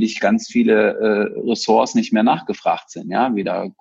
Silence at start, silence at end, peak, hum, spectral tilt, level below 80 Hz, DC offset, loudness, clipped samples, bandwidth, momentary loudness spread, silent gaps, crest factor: 0 s; 0.1 s; -2 dBFS; none; -5 dB/octave; -62 dBFS; under 0.1%; -18 LUFS; under 0.1%; 7.8 kHz; 6 LU; none; 16 dB